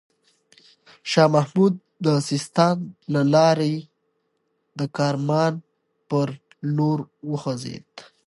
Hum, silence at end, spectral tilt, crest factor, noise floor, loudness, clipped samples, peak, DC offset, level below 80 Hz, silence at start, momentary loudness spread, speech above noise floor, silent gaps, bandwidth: none; 0.25 s; -6.5 dB/octave; 20 dB; -72 dBFS; -22 LUFS; under 0.1%; -4 dBFS; under 0.1%; -70 dBFS; 1.05 s; 14 LU; 51 dB; none; 11.5 kHz